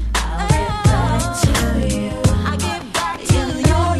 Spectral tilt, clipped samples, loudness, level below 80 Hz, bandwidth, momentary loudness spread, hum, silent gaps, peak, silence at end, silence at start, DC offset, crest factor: -5 dB/octave; under 0.1%; -18 LUFS; -24 dBFS; 13 kHz; 5 LU; none; none; -2 dBFS; 0 s; 0 s; under 0.1%; 16 dB